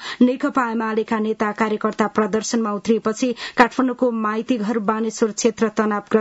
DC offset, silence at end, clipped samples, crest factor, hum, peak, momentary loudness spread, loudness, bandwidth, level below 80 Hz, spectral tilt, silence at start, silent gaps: under 0.1%; 0 s; under 0.1%; 20 dB; none; 0 dBFS; 5 LU; -20 LUFS; 8 kHz; -60 dBFS; -4.5 dB/octave; 0 s; none